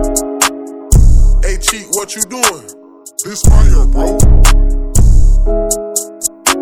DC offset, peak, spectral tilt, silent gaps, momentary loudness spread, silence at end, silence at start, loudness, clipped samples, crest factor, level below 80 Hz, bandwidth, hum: under 0.1%; 0 dBFS; -4 dB/octave; none; 8 LU; 0 s; 0 s; -13 LUFS; 3%; 8 dB; -10 dBFS; 16.5 kHz; none